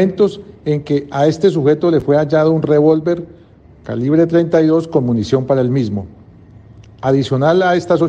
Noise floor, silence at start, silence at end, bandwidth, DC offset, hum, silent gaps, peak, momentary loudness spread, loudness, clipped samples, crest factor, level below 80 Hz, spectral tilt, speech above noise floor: -43 dBFS; 0 s; 0 s; 8.4 kHz; under 0.1%; none; none; 0 dBFS; 10 LU; -14 LUFS; under 0.1%; 14 dB; -48 dBFS; -8 dB/octave; 29 dB